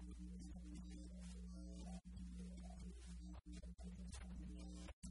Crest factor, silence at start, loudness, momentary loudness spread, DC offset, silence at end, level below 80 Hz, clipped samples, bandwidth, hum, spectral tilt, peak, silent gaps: 12 dB; 0 s; -56 LUFS; 2 LU; under 0.1%; 0 s; -56 dBFS; under 0.1%; 11 kHz; none; -6 dB/octave; -42 dBFS; 4.93-5.02 s